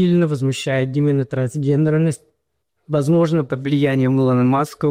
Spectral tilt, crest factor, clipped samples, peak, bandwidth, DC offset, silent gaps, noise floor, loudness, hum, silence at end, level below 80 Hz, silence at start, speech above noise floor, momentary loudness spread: -7.5 dB/octave; 10 dB; under 0.1%; -8 dBFS; 14.5 kHz; under 0.1%; none; -73 dBFS; -18 LUFS; none; 0 s; -56 dBFS; 0 s; 56 dB; 5 LU